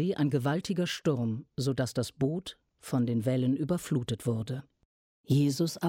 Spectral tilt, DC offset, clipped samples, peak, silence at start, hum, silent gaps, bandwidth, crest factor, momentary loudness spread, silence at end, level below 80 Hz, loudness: -6.5 dB/octave; under 0.1%; under 0.1%; -14 dBFS; 0 s; none; 4.85-5.24 s; 16.5 kHz; 16 dB; 7 LU; 0 s; -62 dBFS; -31 LUFS